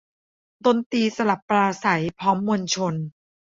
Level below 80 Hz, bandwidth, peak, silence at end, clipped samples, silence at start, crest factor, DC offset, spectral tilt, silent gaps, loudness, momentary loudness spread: -62 dBFS; 7.8 kHz; -4 dBFS; 0.35 s; under 0.1%; 0.65 s; 20 dB; under 0.1%; -5 dB/octave; 0.86-0.90 s, 1.42-1.48 s; -22 LUFS; 4 LU